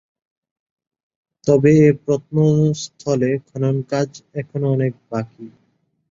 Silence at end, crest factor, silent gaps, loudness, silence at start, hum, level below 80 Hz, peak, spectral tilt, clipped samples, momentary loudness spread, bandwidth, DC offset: 0.65 s; 18 dB; none; -18 LUFS; 1.45 s; none; -56 dBFS; -2 dBFS; -7.5 dB/octave; under 0.1%; 14 LU; 7.6 kHz; under 0.1%